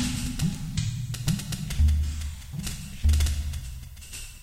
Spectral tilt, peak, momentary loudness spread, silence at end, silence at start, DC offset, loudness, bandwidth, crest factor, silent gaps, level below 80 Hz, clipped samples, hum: -4.5 dB/octave; -12 dBFS; 15 LU; 0 s; 0 s; under 0.1%; -29 LUFS; 16 kHz; 16 dB; none; -30 dBFS; under 0.1%; none